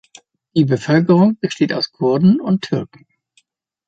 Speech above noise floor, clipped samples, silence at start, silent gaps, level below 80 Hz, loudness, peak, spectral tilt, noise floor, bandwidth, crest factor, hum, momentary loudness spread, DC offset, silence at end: 46 dB; under 0.1%; 0.55 s; none; -58 dBFS; -16 LUFS; -2 dBFS; -7.5 dB/octave; -61 dBFS; 7.8 kHz; 14 dB; none; 9 LU; under 0.1%; 1 s